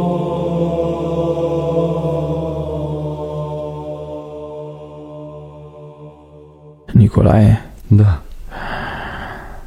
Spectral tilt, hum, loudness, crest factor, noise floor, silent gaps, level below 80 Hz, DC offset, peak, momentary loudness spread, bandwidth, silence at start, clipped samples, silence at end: -9 dB/octave; none; -17 LUFS; 18 dB; -41 dBFS; none; -32 dBFS; under 0.1%; 0 dBFS; 21 LU; 6 kHz; 0 s; under 0.1%; 0 s